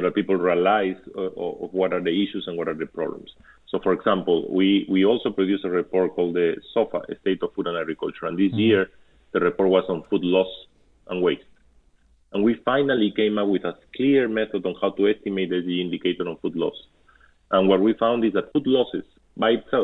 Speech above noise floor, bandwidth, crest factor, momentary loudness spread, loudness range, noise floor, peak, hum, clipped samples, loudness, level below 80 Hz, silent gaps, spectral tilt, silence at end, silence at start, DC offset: 37 dB; 4.1 kHz; 18 dB; 9 LU; 3 LU; -59 dBFS; -6 dBFS; none; under 0.1%; -23 LUFS; -60 dBFS; none; -8.5 dB/octave; 0 s; 0 s; under 0.1%